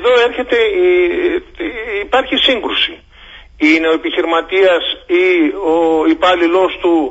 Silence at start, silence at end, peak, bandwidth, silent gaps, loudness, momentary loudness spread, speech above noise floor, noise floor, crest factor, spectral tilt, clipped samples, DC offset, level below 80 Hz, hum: 0 s; 0 s; 0 dBFS; 8 kHz; none; -13 LUFS; 6 LU; 25 dB; -38 dBFS; 14 dB; -4 dB/octave; under 0.1%; under 0.1%; -42 dBFS; none